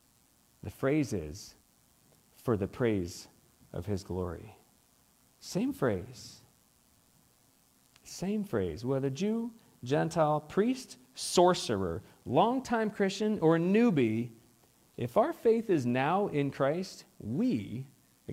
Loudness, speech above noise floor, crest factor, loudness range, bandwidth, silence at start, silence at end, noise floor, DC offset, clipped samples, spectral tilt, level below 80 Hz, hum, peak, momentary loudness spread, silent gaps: -31 LUFS; 36 dB; 20 dB; 9 LU; 16 kHz; 0.65 s; 0 s; -67 dBFS; under 0.1%; under 0.1%; -6 dB/octave; -64 dBFS; none; -12 dBFS; 20 LU; none